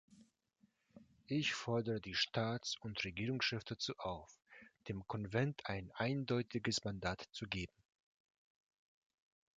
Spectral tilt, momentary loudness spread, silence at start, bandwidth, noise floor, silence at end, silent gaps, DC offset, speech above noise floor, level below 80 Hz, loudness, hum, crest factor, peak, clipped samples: -4.5 dB/octave; 10 LU; 0.1 s; 9.2 kHz; -77 dBFS; 1.9 s; none; under 0.1%; 36 dB; -66 dBFS; -41 LUFS; none; 22 dB; -20 dBFS; under 0.1%